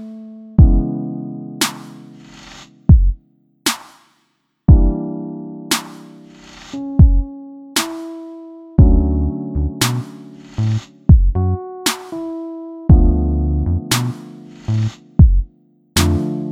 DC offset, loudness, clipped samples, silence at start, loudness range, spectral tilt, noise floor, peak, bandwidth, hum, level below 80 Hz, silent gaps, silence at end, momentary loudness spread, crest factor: under 0.1%; -17 LUFS; under 0.1%; 0 s; 3 LU; -5.5 dB/octave; -65 dBFS; 0 dBFS; 16.5 kHz; none; -20 dBFS; none; 0 s; 21 LU; 16 dB